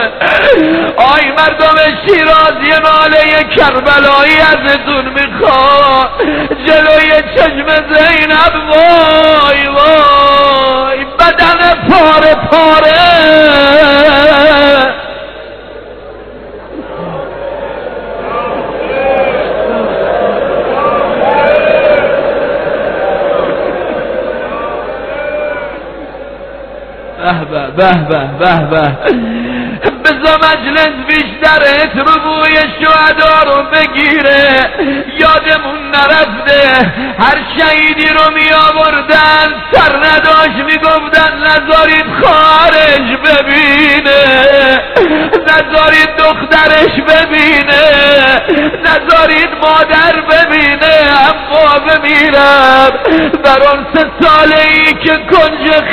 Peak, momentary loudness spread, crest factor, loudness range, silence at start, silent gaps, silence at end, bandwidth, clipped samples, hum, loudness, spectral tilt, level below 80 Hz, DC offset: 0 dBFS; 12 LU; 8 dB; 9 LU; 0 s; none; 0 s; 5.4 kHz; 2%; none; -6 LUFS; -6 dB/octave; -32 dBFS; under 0.1%